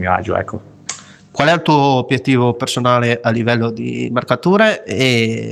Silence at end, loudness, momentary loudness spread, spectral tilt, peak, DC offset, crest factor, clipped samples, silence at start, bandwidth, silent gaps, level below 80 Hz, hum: 0 s; -15 LUFS; 15 LU; -5.5 dB/octave; 0 dBFS; under 0.1%; 16 dB; under 0.1%; 0 s; 13.5 kHz; none; -52 dBFS; none